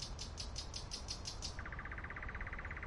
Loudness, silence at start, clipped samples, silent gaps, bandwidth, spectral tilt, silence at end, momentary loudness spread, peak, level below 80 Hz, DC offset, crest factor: -46 LUFS; 0 s; under 0.1%; none; 11.5 kHz; -2.5 dB/octave; 0 s; 3 LU; -28 dBFS; -50 dBFS; under 0.1%; 18 dB